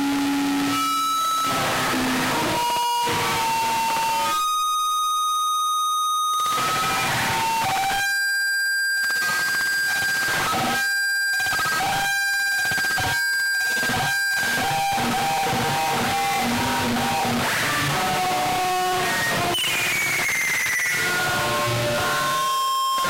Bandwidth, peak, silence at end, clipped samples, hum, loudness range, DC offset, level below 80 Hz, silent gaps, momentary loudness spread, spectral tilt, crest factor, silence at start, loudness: 16 kHz; -16 dBFS; 0 s; under 0.1%; none; 1 LU; under 0.1%; -50 dBFS; none; 2 LU; -2 dB/octave; 8 dB; 0 s; -21 LUFS